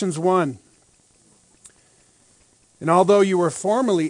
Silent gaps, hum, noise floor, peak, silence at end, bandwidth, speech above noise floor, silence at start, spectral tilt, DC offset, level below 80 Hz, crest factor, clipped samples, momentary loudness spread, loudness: none; none; -58 dBFS; -2 dBFS; 0 s; 10.5 kHz; 39 dB; 0 s; -6 dB/octave; under 0.1%; -68 dBFS; 20 dB; under 0.1%; 12 LU; -19 LUFS